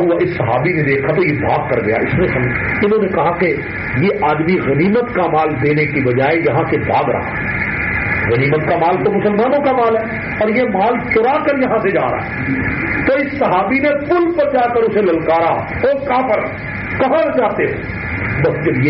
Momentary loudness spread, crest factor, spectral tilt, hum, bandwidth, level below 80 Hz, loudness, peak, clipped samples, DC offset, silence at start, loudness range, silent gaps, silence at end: 4 LU; 12 dB; -6 dB/octave; none; 5.8 kHz; -38 dBFS; -15 LUFS; -2 dBFS; under 0.1%; under 0.1%; 0 s; 1 LU; none; 0 s